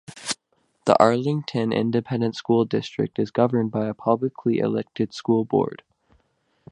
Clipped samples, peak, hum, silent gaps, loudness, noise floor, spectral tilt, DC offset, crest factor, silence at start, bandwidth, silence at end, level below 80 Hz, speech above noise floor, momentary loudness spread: under 0.1%; 0 dBFS; none; none; -23 LUFS; -68 dBFS; -6.5 dB/octave; under 0.1%; 24 dB; 0.1 s; 11.5 kHz; 0.95 s; -62 dBFS; 46 dB; 10 LU